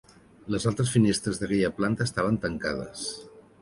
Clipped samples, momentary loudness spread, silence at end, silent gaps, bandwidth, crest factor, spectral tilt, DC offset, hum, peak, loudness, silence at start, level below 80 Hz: under 0.1%; 12 LU; 0.2 s; none; 11.5 kHz; 18 dB; -5.5 dB/octave; under 0.1%; none; -8 dBFS; -27 LUFS; 0.45 s; -52 dBFS